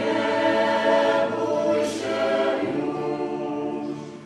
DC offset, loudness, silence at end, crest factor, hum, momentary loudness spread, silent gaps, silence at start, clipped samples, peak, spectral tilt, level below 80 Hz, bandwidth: under 0.1%; -23 LUFS; 0 s; 14 dB; none; 8 LU; none; 0 s; under 0.1%; -8 dBFS; -5 dB/octave; -64 dBFS; 13 kHz